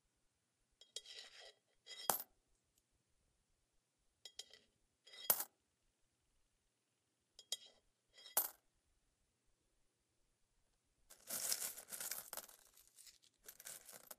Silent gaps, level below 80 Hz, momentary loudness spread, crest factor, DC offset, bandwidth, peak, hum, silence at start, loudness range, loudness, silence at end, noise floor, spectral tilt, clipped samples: none; -86 dBFS; 23 LU; 36 dB; under 0.1%; 15.5 kHz; -16 dBFS; none; 0.8 s; 4 LU; -44 LUFS; 0.05 s; -86 dBFS; 0.5 dB/octave; under 0.1%